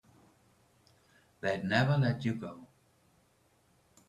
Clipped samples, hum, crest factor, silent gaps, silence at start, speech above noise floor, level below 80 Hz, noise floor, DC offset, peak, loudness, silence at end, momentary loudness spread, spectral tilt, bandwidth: under 0.1%; none; 22 dB; none; 1.45 s; 39 dB; -68 dBFS; -69 dBFS; under 0.1%; -14 dBFS; -32 LUFS; 1.45 s; 16 LU; -7 dB/octave; 10 kHz